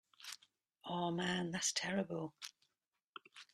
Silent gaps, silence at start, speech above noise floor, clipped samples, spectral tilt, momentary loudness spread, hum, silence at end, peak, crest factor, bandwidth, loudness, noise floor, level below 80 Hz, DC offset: 3.04-3.13 s; 0.2 s; 47 dB; under 0.1%; -3.5 dB/octave; 19 LU; none; 0.1 s; -24 dBFS; 20 dB; 13.5 kHz; -39 LUFS; -87 dBFS; -80 dBFS; under 0.1%